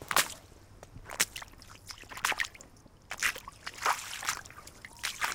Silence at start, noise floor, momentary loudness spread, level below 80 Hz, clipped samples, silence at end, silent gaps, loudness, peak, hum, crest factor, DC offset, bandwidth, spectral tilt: 0 s; -55 dBFS; 19 LU; -60 dBFS; under 0.1%; 0 s; none; -33 LUFS; -6 dBFS; none; 30 dB; under 0.1%; 18 kHz; 0 dB/octave